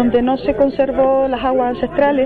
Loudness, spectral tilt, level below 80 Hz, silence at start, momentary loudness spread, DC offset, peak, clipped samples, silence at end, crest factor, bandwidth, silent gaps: -16 LUFS; -8.5 dB/octave; -38 dBFS; 0 s; 3 LU; 0.4%; -4 dBFS; under 0.1%; 0 s; 12 dB; 4.7 kHz; none